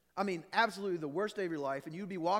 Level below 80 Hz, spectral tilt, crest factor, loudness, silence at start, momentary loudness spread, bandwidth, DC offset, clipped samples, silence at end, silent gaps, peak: -82 dBFS; -5 dB/octave; 20 dB; -36 LUFS; 0.15 s; 7 LU; 16.5 kHz; under 0.1%; under 0.1%; 0 s; none; -16 dBFS